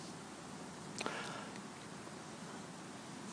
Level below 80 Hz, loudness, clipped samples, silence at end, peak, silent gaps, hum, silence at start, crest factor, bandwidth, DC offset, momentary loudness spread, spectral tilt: -78 dBFS; -47 LUFS; under 0.1%; 0 s; -20 dBFS; none; none; 0 s; 26 dB; 10.5 kHz; under 0.1%; 7 LU; -3.5 dB/octave